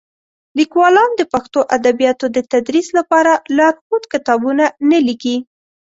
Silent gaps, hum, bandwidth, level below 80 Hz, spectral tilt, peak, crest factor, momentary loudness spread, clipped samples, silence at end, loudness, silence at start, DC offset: 3.81-3.90 s; none; 8 kHz; -58 dBFS; -3.5 dB/octave; -2 dBFS; 12 dB; 8 LU; under 0.1%; 0.45 s; -14 LUFS; 0.55 s; under 0.1%